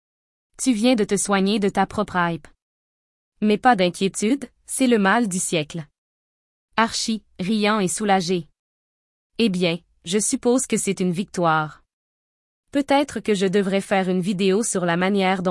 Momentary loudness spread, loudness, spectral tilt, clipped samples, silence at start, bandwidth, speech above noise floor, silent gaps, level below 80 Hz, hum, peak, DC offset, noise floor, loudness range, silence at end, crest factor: 8 LU; -21 LUFS; -4.5 dB/octave; under 0.1%; 0.6 s; 12 kHz; over 70 dB; 2.62-3.32 s, 5.98-6.68 s, 8.59-9.30 s, 11.93-12.63 s; -56 dBFS; none; -4 dBFS; under 0.1%; under -90 dBFS; 2 LU; 0 s; 18 dB